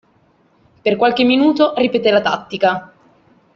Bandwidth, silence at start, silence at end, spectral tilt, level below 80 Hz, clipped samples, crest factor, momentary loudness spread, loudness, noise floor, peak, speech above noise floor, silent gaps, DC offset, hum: 7 kHz; 0.85 s; 0.7 s; -6 dB/octave; -58 dBFS; under 0.1%; 14 dB; 7 LU; -15 LUFS; -56 dBFS; -2 dBFS; 41 dB; none; under 0.1%; none